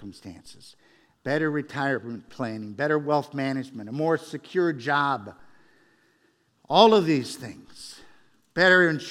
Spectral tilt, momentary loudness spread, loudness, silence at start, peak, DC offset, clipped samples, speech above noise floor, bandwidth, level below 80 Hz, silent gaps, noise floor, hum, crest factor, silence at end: -5.5 dB/octave; 25 LU; -24 LUFS; 0 s; -4 dBFS; under 0.1%; under 0.1%; 42 dB; 14.5 kHz; -70 dBFS; none; -66 dBFS; none; 22 dB; 0 s